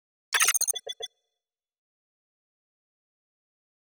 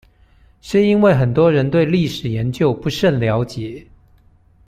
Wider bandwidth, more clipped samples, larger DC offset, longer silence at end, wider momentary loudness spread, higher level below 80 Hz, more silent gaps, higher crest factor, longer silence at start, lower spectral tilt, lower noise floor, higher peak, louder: first, over 20 kHz vs 15 kHz; neither; neither; first, 2.95 s vs 0.85 s; first, 17 LU vs 11 LU; second, -86 dBFS vs -46 dBFS; neither; first, 26 dB vs 16 dB; second, 0.3 s vs 0.65 s; second, 5 dB/octave vs -7.5 dB/octave; first, -89 dBFS vs -51 dBFS; second, -8 dBFS vs -2 dBFS; second, -24 LUFS vs -16 LUFS